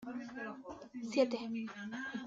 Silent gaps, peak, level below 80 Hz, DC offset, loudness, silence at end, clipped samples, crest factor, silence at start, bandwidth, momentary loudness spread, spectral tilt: none; -18 dBFS; -76 dBFS; under 0.1%; -39 LUFS; 0 s; under 0.1%; 20 dB; 0 s; 7.8 kHz; 13 LU; -5 dB/octave